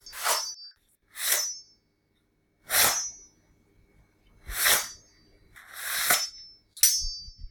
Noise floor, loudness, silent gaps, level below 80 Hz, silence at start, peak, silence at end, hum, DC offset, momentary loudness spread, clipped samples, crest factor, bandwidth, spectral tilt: -71 dBFS; -25 LUFS; none; -50 dBFS; 0.05 s; -6 dBFS; 0 s; none; under 0.1%; 21 LU; under 0.1%; 26 dB; 19 kHz; 1.5 dB/octave